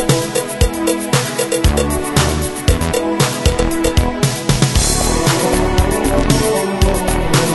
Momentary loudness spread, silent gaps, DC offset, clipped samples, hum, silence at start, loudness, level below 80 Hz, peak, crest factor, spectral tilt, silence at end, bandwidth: 3 LU; none; under 0.1%; under 0.1%; none; 0 s; -15 LUFS; -22 dBFS; 0 dBFS; 14 dB; -4.5 dB/octave; 0 s; 12.5 kHz